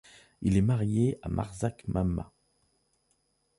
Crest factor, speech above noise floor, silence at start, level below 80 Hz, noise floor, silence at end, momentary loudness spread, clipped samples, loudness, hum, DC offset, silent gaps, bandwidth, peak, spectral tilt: 18 dB; 45 dB; 0.4 s; -46 dBFS; -74 dBFS; 1.35 s; 8 LU; under 0.1%; -30 LUFS; none; under 0.1%; none; 11.5 kHz; -12 dBFS; -8 dB/octave